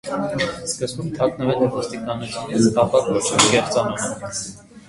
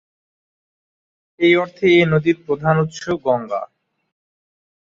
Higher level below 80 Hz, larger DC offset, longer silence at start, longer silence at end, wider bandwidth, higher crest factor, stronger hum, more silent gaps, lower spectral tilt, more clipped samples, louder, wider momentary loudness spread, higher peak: about the same, -50 dBFS vs -54 dBFS; neither; second, 0.05 s vs 1.4 s; second, 0.1 s vs 1.25 s; first, 11.5 kHz vs 7.4 kHz; about the same, 20 dB vs 18 dB; neither; neither; second, -4 dB/octave vs -6.5 dB/octave; neither; second, -20 LUFS vs -17 LUFS; about the same, 12 LU vs 11 LU; about the same, 0 dBFS vs -2 dBFS